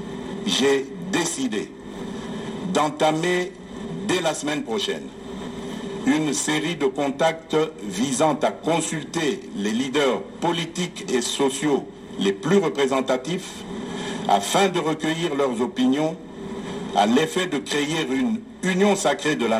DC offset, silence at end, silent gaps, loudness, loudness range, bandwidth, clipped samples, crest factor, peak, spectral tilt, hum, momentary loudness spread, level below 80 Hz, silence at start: under 0.1%; 0 s; none; -23 LUFS; 2 LU; 16 kHz; under 0.1%; 18 dB; -6 dBFS; -4 dB/octave; none; 12 LU; -56 dBFS; 0 s